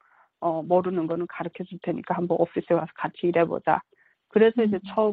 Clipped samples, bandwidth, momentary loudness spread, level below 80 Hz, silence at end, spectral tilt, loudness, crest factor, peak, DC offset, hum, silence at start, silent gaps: under 0.1%; 4.7 kHz; 11 LU; -68 dBFS; 0 s; -10 dB/octave; -25 LUFS; 20 dB; -6 dBFS; under 0.1%; none; 0.4 s; none